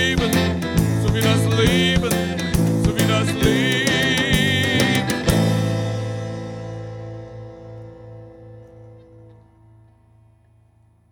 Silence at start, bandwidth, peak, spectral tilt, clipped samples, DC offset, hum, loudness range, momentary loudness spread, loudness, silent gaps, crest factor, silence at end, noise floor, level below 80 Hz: 0 s; 19.5 kHz; -2 dBFS; -5 dB/octave; under 0.1%; under 0.1%; none; 18 LU; 20 LU; -19 LUFS; none; 18 dB; 2.15 s; -56 dBFS; -34 dBFS